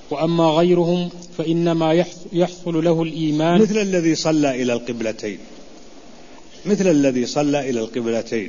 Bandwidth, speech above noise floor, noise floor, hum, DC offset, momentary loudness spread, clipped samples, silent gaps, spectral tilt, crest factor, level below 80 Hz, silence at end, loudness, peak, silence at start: 7.4 kHz; 25 dB; -43 dBFS; none; 0.8%; 10 LU; under 0.1%; none; -6 dB/octave; 16 dB; -54 dBFS; 0 s; -19 LUFS; -4 dBFS; 0 s